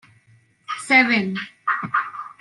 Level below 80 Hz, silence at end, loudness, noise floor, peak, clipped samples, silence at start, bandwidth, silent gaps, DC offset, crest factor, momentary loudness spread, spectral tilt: -70 dBFS; 0.1 s; -19 LUFS; -57 dBFS; -2 dBFS; under 0.1%; 0.7 s; 11.5 kHz; none; under 0.1%; 20 dB; 17 LU; -4 dB/octave